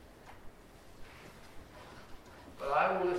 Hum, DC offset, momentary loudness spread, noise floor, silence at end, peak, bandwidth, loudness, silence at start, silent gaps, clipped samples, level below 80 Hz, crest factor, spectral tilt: none; under 0.1%; 26 LU; -56 dBFS; 0 s; -18 dBFS; 16 kHz; -32 LUFS; 0 s; none; under 0.1%; -58 dBFS; 20 dB; -5.5 dB/octave